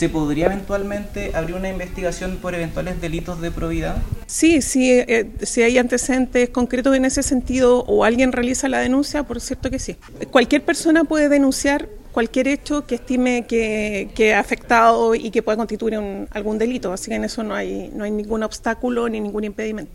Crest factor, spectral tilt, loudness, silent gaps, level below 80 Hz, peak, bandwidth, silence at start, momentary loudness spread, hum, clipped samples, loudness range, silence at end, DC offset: 18 dB; -4.5 dB/octave; -19 LUFS; none; -36 dBFS; -2 dBFS; 16 kHz; 0 s; 11 LU; none; under 0.1%; 7 LU; 0 s; under 0.1%